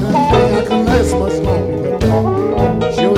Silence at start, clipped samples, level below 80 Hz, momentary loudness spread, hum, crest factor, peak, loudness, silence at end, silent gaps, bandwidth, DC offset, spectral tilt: 0 s; under 0.1%; -26 dBFS; 4 LU; none; 12 dB; 0 dBFS; -14 LUFS; 0 s; none; 15.5 kHz; under 0.1%; -7 dB/octave